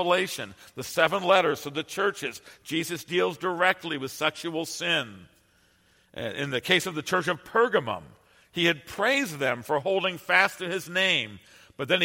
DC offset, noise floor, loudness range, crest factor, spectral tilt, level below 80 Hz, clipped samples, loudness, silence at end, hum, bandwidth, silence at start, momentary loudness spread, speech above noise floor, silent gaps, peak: under 0.1%; -64 dBFS; 4 LU; 24 dB; -3.5 dB/octave; -68 dBFS; under 0.1%; -26 LUFS; 0 s; none; 16.5 kHz; 0 s; 14 LU; 37 dB; none; -4 dBFS